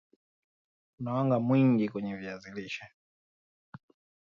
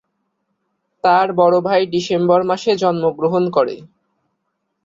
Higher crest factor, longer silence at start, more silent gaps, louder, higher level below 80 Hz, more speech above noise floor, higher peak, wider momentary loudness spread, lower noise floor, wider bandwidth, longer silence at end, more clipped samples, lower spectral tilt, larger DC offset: about the same, 16 dB vs 16 dB; about the same, 1 s vs 1.05 s; first, 2.94-3.72 s vs none; second, -29 LUFS vs -16 LUFS; second, -72 dBFS vs -62 dBFS; first, over 61 dB vs 57 dB; second, -16 dBFS vs -2 dBFS; first, 16 LU vs 5 LU; first, under -90 dBFS vs -72 dBFS; about the same, 7.2 kHz vs 7.6 kHz; second, 0.55 s vs 1 s; neither; first, -8.5 dB/octave vs -6 dB/octave; neither